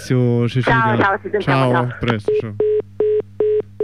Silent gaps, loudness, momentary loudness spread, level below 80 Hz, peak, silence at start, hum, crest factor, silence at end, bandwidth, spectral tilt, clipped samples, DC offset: none; -17 LUFS; 4 LU; -46 dBFS; -6 dBFS; 0 s; none; 12 dB; 0 s; 11 kHz; -7.5 dB/octave; under 0.1%; 0.5%